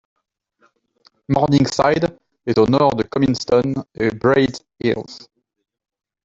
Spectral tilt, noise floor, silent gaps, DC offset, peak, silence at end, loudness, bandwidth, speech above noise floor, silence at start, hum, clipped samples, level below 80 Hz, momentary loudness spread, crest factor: -6.5 dB/octave; -62 dBFS; none; under 0.1%; -2 dBFS; 1.05 s; -18 LUFS; 7.8 kHz; 45 dB; 1.3 s; none; under 0.1%; -50 dBFS; 9 LU; 16 dB